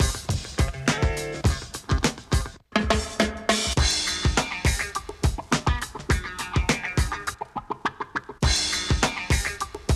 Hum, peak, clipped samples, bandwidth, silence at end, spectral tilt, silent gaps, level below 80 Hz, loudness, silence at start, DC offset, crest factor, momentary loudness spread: none; -8 dBFS; under 0.1%; 14.5 kHz; 0 s; -3.5 dB/octave; none; -30 dBFS; -25 LUFS; 0 s; under 0.1%; 18 dB; 8 LU